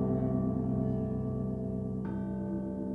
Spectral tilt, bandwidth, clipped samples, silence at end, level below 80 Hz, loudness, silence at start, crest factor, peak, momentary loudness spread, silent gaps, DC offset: -12 dB/octave; 3.1 kHz; under 0.1%; 0 s; -48 dBFS; -34 LUFS; 0 s; 14 dB; -18 dBFS; 5 LU; none; under 0.1%